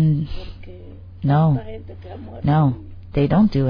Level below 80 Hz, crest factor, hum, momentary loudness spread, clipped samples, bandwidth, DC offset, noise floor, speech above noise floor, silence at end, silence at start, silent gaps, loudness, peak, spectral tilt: -36 dBFS; 14 dB; none; 22 LU; under 0.1%; 5.2 kHz; under 0.1%; -38 dBFS; 19 dB; 0 s; 0 s; none; -20 LUFS; -6 dBFS; -10.5 dB/octave